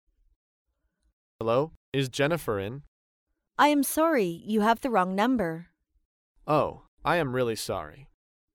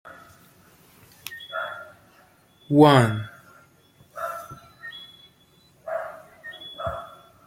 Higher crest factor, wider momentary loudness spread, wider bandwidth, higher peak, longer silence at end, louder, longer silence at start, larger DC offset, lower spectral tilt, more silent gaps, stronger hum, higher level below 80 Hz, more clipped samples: second, 18 dB vs 26 dB; second, 12 LU vs 27 LU; about the same, 17.5 kHz vs 16.5 kHz; second, -10 dBFS vs -2 dBFS; about the same, 0.5 s vs 0.4 s; second, -27 LUFS vs -23 LUFS; first, 1.4 s vs 1.25 s; neither; second, -5 dB/octave vs -6.5 dB/octave; first, 1.77-1.92 s, 2.88-3.27 s, 6.05-6.35 s, 6.88-6.97 s vs none; neither; about the same, -58 dBFS vs -60 dBFS; neither